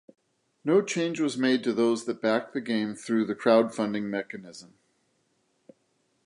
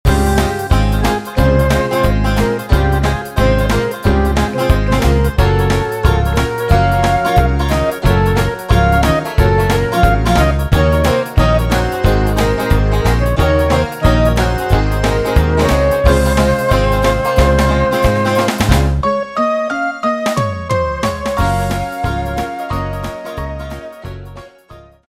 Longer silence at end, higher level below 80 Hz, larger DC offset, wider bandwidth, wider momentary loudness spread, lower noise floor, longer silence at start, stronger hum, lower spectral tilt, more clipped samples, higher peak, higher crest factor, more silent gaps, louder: first, 1.6 s vs 0.4 s; second, -78 dBFS vs -18 dBFS; neither; second, 11.5 kHz vs 16 kHz; first, 12 LU vs 7 LU; first, -72 dBFS vs -40 dBFS; first, 0.65 s vs 0.05 s; neither; about the same, -5 dB/octave vs -6 dB/octave; neither; second, -8 dBFS vs 0 dBFS; first, 20 dB vs 12 dB; neither; second, -27 LUFS vs -14 LUFS